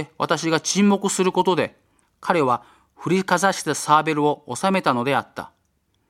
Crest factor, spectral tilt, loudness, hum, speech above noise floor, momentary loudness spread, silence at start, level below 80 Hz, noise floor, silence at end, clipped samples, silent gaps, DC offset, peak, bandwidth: 20 dB; -4.5 dB/octave; -21 LUFS; none; 47 dB; 10 LU; 0 s; -66 dBFS; -68 dBFS; 0.6 s; under 0.1%; none; under 0.1%; -2 dBFS; 15.5 kHz